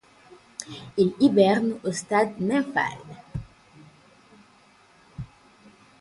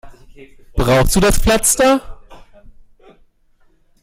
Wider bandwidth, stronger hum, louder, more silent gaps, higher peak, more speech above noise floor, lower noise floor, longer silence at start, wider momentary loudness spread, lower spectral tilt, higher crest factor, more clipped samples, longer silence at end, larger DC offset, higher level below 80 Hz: second, 11.5 kHz vs 16.5 kHz; neither; second, -23 LUFS vs -14 LUFS; neither; second, -6 dBFS vs 0 dBFS; second, 34 dB vs 40 dB; first, -57 dBFS vs -53 dBFS; first, 0.6 s vs 0.05 s; first, 22 LU vs 8 LU; first, -5.5 dB/octave vs -4 dB/octave; about the same, 20 dB vs 16 dB; neither; second, 0.75 s vs 1.65 s; neither; second, -56 dBFS vs -26 dBFS